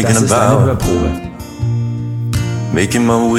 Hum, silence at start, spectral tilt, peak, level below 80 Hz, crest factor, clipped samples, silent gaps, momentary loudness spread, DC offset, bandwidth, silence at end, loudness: none; 0 s; -5.5 dB/octave; 0 dBFS; -30 dBFS; 14 dB; under 0.1%; none; 10 LU; under 0.1%; 15.5 kHz; 0 s; -15 LUFS